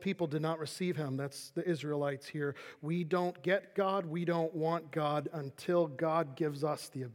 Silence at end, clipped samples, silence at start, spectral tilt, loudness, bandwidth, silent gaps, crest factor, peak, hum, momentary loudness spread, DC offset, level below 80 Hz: 0 s; under 0.1%; 0 s; -6.5 dB/octave; -35 LUFS; 16.5 kHz; none; 16 dB; -18 dBFS; none; 7 LU; under 0.1%; -86 dBFS